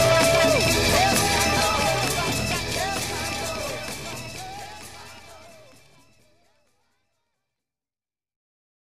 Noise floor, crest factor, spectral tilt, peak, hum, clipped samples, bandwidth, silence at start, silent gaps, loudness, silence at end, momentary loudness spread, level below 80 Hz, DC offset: under -90 dBFS; 20 dB; -3 dB/octave; -6 dBFS; none; under 0.1%; 15.5 kHz; 0 s; none; -22 LUFS; 3.4 s; 19 LU; -42 dBFS; 0.4%